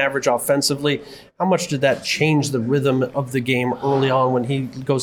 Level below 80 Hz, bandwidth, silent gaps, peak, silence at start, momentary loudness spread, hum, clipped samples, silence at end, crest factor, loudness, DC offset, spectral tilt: -58 dBFS; 19 kHz; none; -4 dBFS; 0 s; 5 LU; none; under 0.1%; 0 s; 16 dB; -20 LUFS; under 0.1%; -5 dB/octave